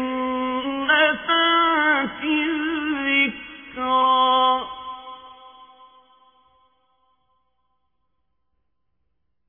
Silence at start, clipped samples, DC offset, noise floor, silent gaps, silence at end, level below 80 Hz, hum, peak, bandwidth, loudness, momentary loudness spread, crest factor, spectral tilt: 0 s; under 0.1%; under 0.1%; -76 dBFS; none; 3.85 s; -60 dBFS; 60 Hz at -70 dBFS; -6 dBFS; 3.6 kHz; -20 LUFS; 19 LU; 18 dB; -6 dB/octave